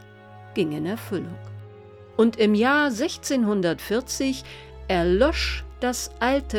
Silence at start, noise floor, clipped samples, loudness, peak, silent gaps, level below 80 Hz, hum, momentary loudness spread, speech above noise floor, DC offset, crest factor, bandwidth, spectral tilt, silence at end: 0 s; -45 dBFS; under 0.1%; -24 LUFS; -8 dBFS; none; -40 dBFS; none; 15 LU; 22 dB; under 0.1%; 16 dB; 19.5 kHz; -4.5 dB/octave; 0 s